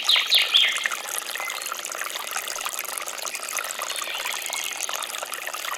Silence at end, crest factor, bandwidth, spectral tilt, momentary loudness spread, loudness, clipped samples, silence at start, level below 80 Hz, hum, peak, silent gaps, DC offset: 0 s; 22 dB; 18 kHz; 3.5 dB/octave; 12 LU; -24 LUFS; under 0.1%; 0 s; -74 dBFS; none; -4 dBFS; none; under 0.1%